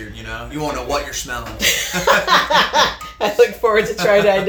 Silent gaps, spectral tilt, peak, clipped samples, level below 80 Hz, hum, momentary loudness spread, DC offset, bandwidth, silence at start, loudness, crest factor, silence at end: none; -2.5 dB/octave; 0 dBFS; under 0.1%; -38 dBFS; none; 12 LU; under 0.1%; over 20 kHz; 0 s; -16 LUFS; 16 dB; 0 s